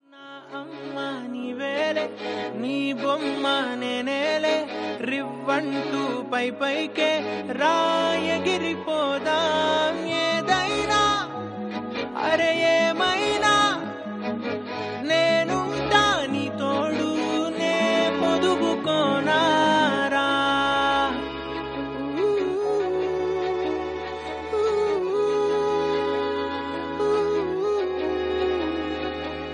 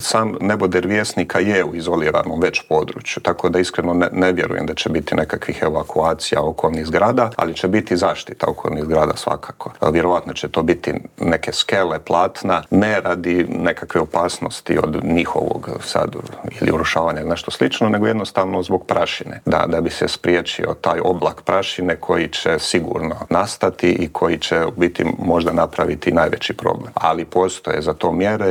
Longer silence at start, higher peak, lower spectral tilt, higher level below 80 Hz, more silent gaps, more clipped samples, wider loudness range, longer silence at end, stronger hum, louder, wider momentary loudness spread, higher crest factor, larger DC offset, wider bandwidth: first, 0.15 s vs 0 s; second, -6 dBFS vs 0 dBFS; about the same, -4 dB/octave vs -5 dB/octave; second, -54 dBFS vs -48 dBFS; neither; neither; first, 4 LU vs 1 LU; about the same, 0 s vs 0 s; neither; second, -24 LUFS vs -19 LUFS; first, 10 LU vs 5 LU; about the same, 18 dB vs 18 dB; neither; second, 11 kHz vs 18.5 kHz